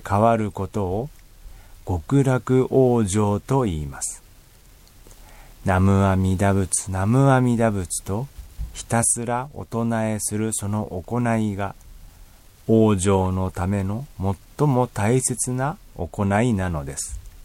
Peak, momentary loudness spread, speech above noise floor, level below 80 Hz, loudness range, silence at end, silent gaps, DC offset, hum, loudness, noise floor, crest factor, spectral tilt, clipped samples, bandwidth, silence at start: -6 dBFS; 12 LU; 28 dB; -42 dBFS; 4 LU; 0.05 s; none; under 0.1%; none; -22 LUFS; -49 dBFS; 16 dB; -6 dB/octave; under 0.1%; 16.5 kHz; 0 s